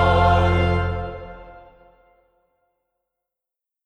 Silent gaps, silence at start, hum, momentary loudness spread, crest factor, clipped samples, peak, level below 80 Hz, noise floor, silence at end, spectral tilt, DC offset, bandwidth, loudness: none; 0 s; none; 23 LU; 18 dB; under 0.1%; -4 dBFS; -32 dBFS; -87 dBFS; 2.25 s; -7.5 dB/octave; under 0.1%; 6.6 kHz; -19 LUFS